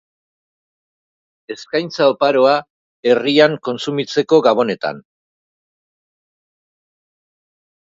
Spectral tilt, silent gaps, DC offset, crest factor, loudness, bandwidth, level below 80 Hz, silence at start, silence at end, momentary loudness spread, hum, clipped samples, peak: -5 dB/octave; 2.70-3.03 s; under 0.1%; 18 dB; -16 LUFS; 7.8 kHz; -68 dBFS; 1.5 s; 2.85 s; 11 LU; none; under 0.1%; 0 dBFS